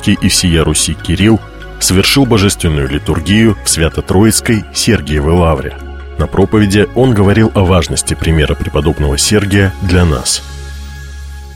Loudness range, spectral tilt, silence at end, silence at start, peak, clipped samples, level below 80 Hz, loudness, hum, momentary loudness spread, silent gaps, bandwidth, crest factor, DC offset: 1 LU; -4.5 dB/octave; 0 s; 0 s; 0 dBFS; under 0.1%; -22 dBFS; -11 LUFS; none; 14 LU; none; 17 kHz; 10 dB; under 0.1%